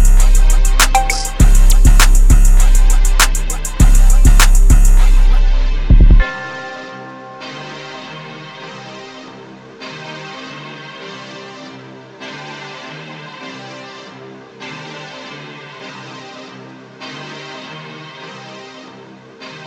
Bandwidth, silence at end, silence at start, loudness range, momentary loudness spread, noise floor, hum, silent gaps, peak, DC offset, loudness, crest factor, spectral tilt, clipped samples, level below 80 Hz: 16.5 kHz; 0.2 s; 0 s; 18 LU; 21 LU; -37 dBFS; none; none; 0 dBFS; under 0.1%; -13 LUFS; 12 dB; -3.5 dB/octave; under 0.1%; -12 dBFS